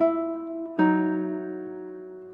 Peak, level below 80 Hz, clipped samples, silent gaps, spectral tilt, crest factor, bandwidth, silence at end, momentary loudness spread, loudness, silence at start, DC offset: -10 dBFS; -74 dBFS; under 0.1%; none; -10.5 dB/octave; 16 dB; 4.1 kHz; 0 s; 16 LU; -27 LUFS; 0 s; under 0.1%